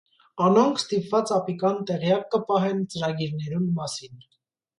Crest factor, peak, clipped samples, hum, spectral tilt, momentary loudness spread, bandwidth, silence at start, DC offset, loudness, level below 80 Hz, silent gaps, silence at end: 18 dB; -8 dBFS; under 0.1%; none; -6 dB/octave; 9 LU; 11.5 kHz; 0.35 s; under 0.1%; -24 LUFS; -66 dBFS; none; 0.6 s